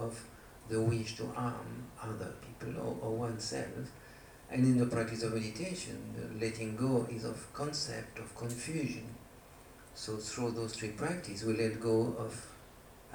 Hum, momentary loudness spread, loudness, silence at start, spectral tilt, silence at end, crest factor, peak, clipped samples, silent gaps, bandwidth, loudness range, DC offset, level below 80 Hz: none; 20 LU; -37 LUFS; 0 s; -5.5 dB/octave; 0 s; 18 dB; -18 dBFS; under 0.1%; none; over 20 kHz; 6 LU; under 0.1%; -62 dBFS